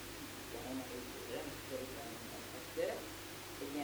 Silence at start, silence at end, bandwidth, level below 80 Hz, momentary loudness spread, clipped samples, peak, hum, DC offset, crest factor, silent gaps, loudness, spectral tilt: 0 s; 0 s; over 20 kHz; -64 dBFS; 6 LU; under 0.1%; -26 dBFS; none; under 0.1%; 18 dB; none; -45 LUFS; -3.5 dB/octave